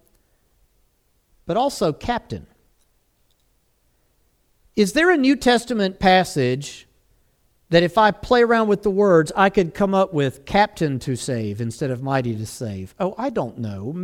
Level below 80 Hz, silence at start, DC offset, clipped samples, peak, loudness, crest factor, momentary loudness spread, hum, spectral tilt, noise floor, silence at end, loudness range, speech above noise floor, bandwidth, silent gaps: -48 dBFS; 1.45 s; under 0.1%; under 0.1%; -2 dBFS; -20 LUFS; 20 dB; 13 LU; none; -5.5 dB/octave; -64 dBFS; 0 s; 10 LU; 45 dB; 16.5 kHz; none